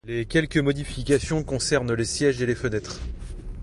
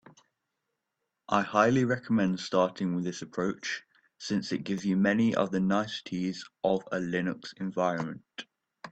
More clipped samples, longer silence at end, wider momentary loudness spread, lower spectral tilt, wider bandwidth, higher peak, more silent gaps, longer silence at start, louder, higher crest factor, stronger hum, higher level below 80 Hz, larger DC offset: neither; about the same, 0 s vs 0.05 s; about the same, 13 LU vs 12 LU; about the same, -5 dB/octave vs -6 dB/octave; first, 11.5 kHz vs 8.4 kHz; about the same, -8 dBFS vs -8 dBFS; neither; second, 0.05 s vs 1.3 s; first, -24 LUFS vs -29 LUFS; about the same, 18 dB vs 22 dB; neither; first, -38 dBFS vs -68 dBFS; neither